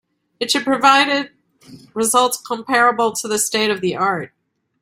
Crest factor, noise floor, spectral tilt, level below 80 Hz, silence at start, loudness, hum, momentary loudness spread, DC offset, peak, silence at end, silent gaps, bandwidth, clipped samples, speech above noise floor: 18 dB; -44 dBFS; -2 dB/octave; -64 dBFS; 0.4 s; -17 LUFS; none; 14 LU; under 0.1%; 0 dBFS; 0.55 s; none; 16 kHz; under 0.1%; 27 dB